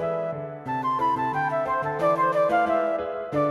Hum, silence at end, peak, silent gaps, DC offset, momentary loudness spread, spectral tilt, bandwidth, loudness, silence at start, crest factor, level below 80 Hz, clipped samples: none; 0 s; -10 dBFS; none; under 0.1%; 8 LU; -7 dB/octave; 12.5 kHz; -25 LUFS; 0 s; 14 dB; -58 dBFS; under 0.1%